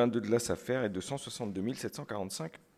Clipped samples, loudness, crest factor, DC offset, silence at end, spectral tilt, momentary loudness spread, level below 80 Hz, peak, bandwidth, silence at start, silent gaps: under 0.1%; -35 LUFS; 18 dB; under 0.1%; 0.2 s; -5 dB/octave; 8 LU; -62 dBFS; -16 dBFS; 15.5 kHz; 0 s; none